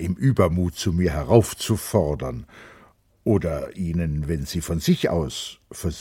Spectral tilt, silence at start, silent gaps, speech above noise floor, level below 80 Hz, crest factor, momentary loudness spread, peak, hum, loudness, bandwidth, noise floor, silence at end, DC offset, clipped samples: -6 dB/octave; 0 s; none; 32 dB; -38 dBFS; 22 dB; 12 LU; 0 dBFS; none; -23 LUFS; 16.5 kHz; -55 dBFS; 0 s; under 0.1%; under 0.1%